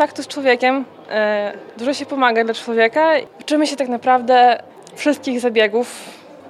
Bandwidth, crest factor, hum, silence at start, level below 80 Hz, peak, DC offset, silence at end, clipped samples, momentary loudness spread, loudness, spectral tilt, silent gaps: 13.5 kHz; 18 dB; none; 0 s; -76 dBFS; 0 dBFS; under 0.1%; 0 s; under 0.1%; 10 LU; -17 LUFS; -3 dB/octave; none